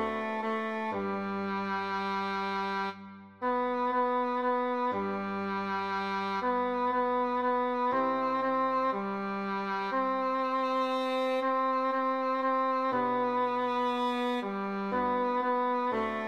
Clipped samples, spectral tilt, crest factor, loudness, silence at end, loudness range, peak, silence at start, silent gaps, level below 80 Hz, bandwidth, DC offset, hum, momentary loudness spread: under 0.1%; -6.5 dB/octave; 10 dB; -30 LUFS; 0 s; 2 LU; -20 dBFS; 0 s; none; -68 dBFS; 9.8 kHz; under 0.1%; none; 5 LU